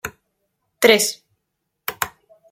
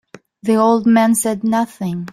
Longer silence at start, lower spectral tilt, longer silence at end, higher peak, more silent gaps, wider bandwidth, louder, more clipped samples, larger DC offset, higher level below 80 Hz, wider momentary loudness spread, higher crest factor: second, 0.05 s vs 0.45 s; second, -1.5 dB/octave vs -5.5 dB/octave; first, 0.45 s vs 0.05 s; about the same, -2 dBFS vs -2 dBFS; neither; about the same, 16.5 kHz vs 16 kHz; about the same, -18 LUFS vs -16 LUFS; neither; neither; about the same, -60 dBFS vs -58 dBFS; first, 19 LU vs 10 LU; first, 22 dB vs 14 dB